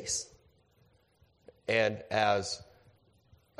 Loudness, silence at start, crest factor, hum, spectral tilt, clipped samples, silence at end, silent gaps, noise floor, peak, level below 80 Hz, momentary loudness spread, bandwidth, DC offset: -31 LUFS; 0 s; 24 dB; none; -2.5 dB/octave; under 0.1%; 0.95 s; none; -68 dBFS; -12 dBFS; -66 dBFS; 14 LU; 13.5 kHz; under 0.1%